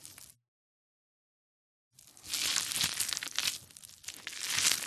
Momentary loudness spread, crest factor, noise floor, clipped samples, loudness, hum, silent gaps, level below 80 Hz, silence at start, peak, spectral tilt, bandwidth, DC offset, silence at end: 21 LU; 34 dB; under -90 dBFS; under 0.1%; -32 LUFS; none; 0.48-1.91 s; -68 dBFS; 0 s; -4 dBFS; 1.5 dB/octave; 13.5 kHz; under 0.1%; 0 s